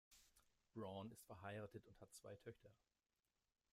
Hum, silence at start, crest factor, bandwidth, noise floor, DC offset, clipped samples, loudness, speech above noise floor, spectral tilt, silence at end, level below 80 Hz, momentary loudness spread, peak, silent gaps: none; 0.1 s; 18 dB; 15.5 kHz; under -90 dBFS; under 0.1%; under 0.1%; -58 LUFS; over 33 dB; -5.5 dB/octave; 1 s; -84 dBFS; 9 LU; -40 dBFS; none